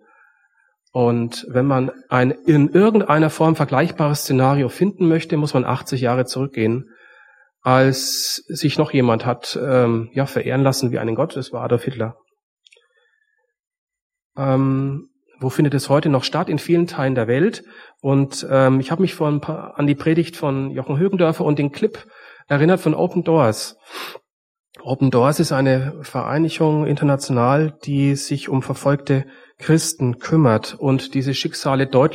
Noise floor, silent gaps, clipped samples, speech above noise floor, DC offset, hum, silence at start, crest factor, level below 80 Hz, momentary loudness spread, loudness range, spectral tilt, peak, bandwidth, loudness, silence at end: -68 dBFS; 12.43-12.57 s, 13.67-13.71 s, 13.78-13.87 s, 14.02-14.10 s, 14.25-14.30 s, 24.33-24.64 s; under 0.1%; 50 dB; under 0.1%; none; 0.95 s; 18 dB; -58 dBFS; 8 LU; 6 LU; -6 dB/octave; -2 dBFS; 16 kHz; -19 LUFS; 0 s